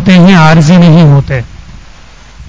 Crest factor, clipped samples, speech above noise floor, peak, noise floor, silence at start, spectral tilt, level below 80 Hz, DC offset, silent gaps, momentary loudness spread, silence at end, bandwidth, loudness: 6 dB; 7%; 30 dB; 0 dBFS; -33 dBFS; 0 s; -7 dB/octave; -28 dBFS; under 0.1%; none; 13 LU; 0 s; 8 kHz; -4 LUFS